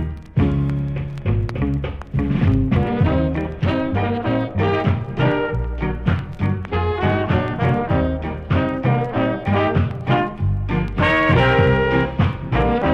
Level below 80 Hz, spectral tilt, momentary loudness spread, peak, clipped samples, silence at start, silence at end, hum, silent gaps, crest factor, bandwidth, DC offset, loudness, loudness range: -30 dBFS; -9 dB/octave; 7 LU; -2 dBFS; under 0.1%; 0 s; 0 s; none; none; 16 dB; 6.4 kHz; under 0.1%; -20 LUFS; 3 LU